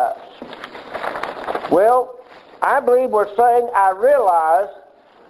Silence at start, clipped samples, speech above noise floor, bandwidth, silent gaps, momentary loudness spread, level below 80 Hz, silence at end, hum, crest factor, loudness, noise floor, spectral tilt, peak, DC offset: 0 s; under 0.1%; 33 dB; 13.5 kHz; none; 18 LU; -60 dBFS; 0.55 s; none; 18 dB; -17 LUFS; -47 dBFS; -4.5 dB/octave; 0 dBFS; under 0.1%